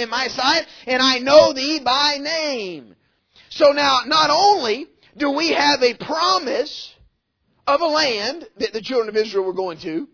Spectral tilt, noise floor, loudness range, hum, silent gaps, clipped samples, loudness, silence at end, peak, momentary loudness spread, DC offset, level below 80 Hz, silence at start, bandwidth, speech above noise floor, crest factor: -2 dB/octave; -68 dBFS; 5 LU; none; none; under 0.1%; -18 LUFS; 0.1 s; 0 dBFS; 13 LU; under 0.1%; -58 dBFS; 0 s; 5.4 kHz; 49 dB; 18 dB